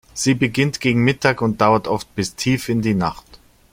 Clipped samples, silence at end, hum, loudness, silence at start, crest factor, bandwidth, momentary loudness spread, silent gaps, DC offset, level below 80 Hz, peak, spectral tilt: under 0.1%; 0.35 s; none; -19 LUFS; 0.15 s; 18 dB; 16.5 kHz; 7 LU; none; under 0.1%; -48 dBFS; 0 dBFS; -5 dB/octave